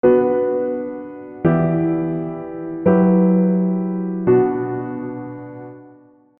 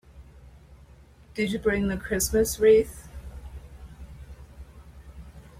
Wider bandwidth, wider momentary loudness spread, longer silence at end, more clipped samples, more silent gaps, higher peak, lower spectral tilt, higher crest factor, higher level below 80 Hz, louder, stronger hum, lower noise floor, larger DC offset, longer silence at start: second, 3.2 kHz vs 16.5 kHz; second, 18 LU vs 27 LU; first, 0.5 s vs 0.2 s; neither; neither; first, -2 dBFS vs -8 dBFS; first, -13.5 dB/octave vs -4.5 dB/octave; about the same, 16 dB vs 20 dB; second, -54 dBFS vs -44 dBFS; first, -19 LUFS vs -24 LUFS; neither; second, -48 dBFS vs -52 dBFS; neither; about the same, 0.05 s vs 0.15 s